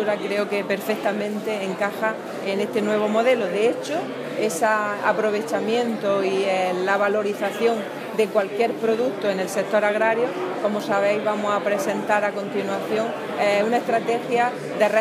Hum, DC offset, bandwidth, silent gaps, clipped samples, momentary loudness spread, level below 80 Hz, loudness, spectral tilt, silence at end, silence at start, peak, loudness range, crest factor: none; under 0.1%; 15.5 kHz; none; under 0.1%; 6 LU; -80 dBFS; -22 LUFS; -4.5 dB/octave; 0 s; 0 s; -6 dBFS; 1 LU; 16 dB